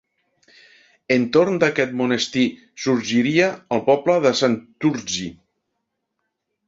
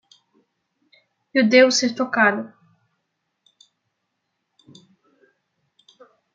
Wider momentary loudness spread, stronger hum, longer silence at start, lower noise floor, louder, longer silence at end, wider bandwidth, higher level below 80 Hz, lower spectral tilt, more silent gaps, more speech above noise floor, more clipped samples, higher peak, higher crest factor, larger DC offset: second, 8 LU vs 14 LU; neither; second, 1.1 s vs 1.35 s; about the same, -77 dBFS vs -77 dBFS; about the same, -20 LUFS vs -18 LUFS; second, 1.35 s vs 3.9 s; about the same, 7.8 kHz vs 7.6 kHz; first, -60 dBFS vs -78 dBFS; first, -4.5 dB/octave vs -3 dB/octave; neither; about the same, 57 dB vs 59 dB; neither; about the same, -2 dBFS vs -2 dBFS; about the same, 18 dB vs 22 dB; neither